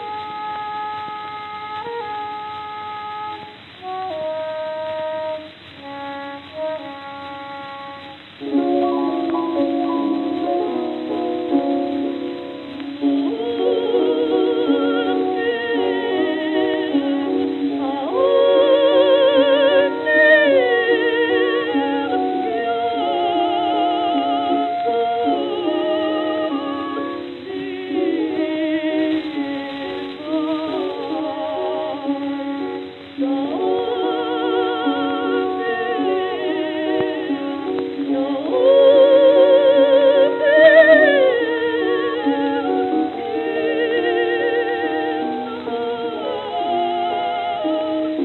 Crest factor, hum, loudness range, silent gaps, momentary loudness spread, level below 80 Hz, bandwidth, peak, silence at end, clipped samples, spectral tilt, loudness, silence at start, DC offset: 18 dB; none; 13 LU; none; 16 LU; -66 dBFS; 4.3 kHz; 0 dBFS; 0 s; under 0.1%; -7 dB/octave; -19 LUFS; 0 s; under 0.1%